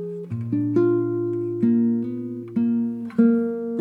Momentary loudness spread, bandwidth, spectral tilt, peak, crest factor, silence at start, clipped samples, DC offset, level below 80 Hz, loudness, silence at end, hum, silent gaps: 10 LU; 2.7 kHz; -11.5 dB/octave; -6 dBFS; 16 dB; 0 s; under 0.1%; under 0.1%; -70 dBFS; -23 LUFS; 0 s; none; none